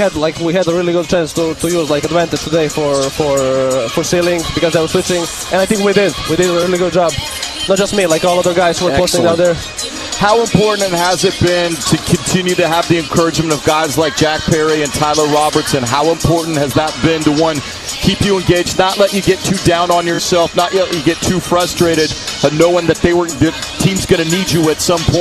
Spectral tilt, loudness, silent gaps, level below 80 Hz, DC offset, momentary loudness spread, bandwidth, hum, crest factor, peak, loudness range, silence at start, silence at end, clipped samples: -4 dB/octave; -13 LUFS; none; -36 dBFS; under 0.1%; 4 LU; 14 kHz; none; 14 dB; 0 dBFS; 1 LU; 0 s; 0 s; under 0.1%